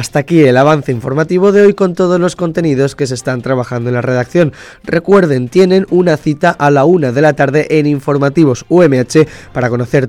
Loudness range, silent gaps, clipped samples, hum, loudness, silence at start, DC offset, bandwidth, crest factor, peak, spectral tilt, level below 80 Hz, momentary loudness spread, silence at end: 3 LU; none; 0.3%; none; -11 LUFS; 0 s; under 0.1%; 13.5 kHz; 10 dB; 0 dBFS; -7 dB/octave; -46 dBFS; 7 LU; 0 s